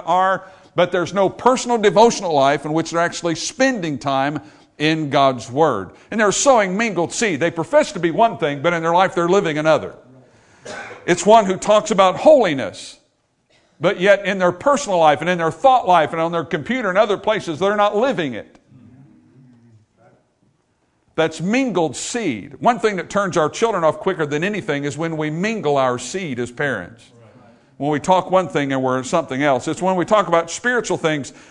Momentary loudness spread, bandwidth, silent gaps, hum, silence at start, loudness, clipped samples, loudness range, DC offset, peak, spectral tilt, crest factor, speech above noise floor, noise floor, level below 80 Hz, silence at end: 9 LU; 11 kHz; none; none; 0 s; -18 LUFS; under 0.1%; 6 LU; under 0.1%; 0 dBFS; -4.5 dB/octave; 18 dB; 46 dB; -64 dBFS; -56 dBFS; 0.2 s